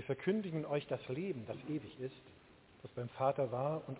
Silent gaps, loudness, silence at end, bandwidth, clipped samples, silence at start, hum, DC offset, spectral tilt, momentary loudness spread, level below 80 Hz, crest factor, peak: none; -40 LUFS; 0 s; 4 kHz; under 0.1%; 0 s; none; under 0.1%; -6.5 dB/octave; 12 LU; -72 dBFS; 18 dB; -20 dBFS